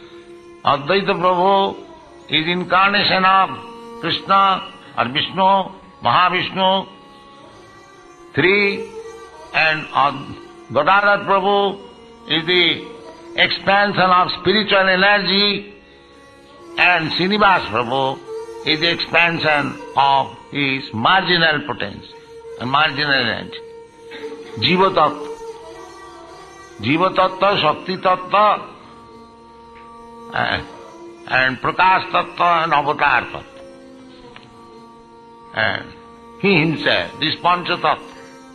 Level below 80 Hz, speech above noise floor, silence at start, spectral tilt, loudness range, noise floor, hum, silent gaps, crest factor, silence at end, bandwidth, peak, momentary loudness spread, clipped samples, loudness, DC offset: -52 dBFS; 28 dB; 0 s; -5.5 dB/octave; 5 LU; -45 dBFS; none; none; 18 dB; 0 s; 10.5 kHz; 0 dBFS; 19 LU; under 0.1%; -16 LUFS; under 0.1%